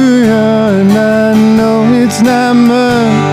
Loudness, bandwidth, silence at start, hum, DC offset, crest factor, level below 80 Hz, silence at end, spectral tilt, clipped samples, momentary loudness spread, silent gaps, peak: -8 LUFS; 15.5 kHz; 0 s; none; under 0.1%; 8 dB; -44 dBFS; 0 s; -6 dB/octave; under 0.1%; 1 LU; none; 0 dBFS